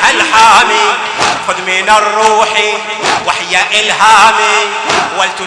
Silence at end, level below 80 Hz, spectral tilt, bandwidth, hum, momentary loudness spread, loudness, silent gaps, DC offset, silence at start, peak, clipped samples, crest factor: 0 s; -46 dBFS; -0.5 dB/octave; 11 kHz; none; 8 LU; -8 LUFS; none; under 0.1%; 0 s; 0 dBFS; 3%; 10 dB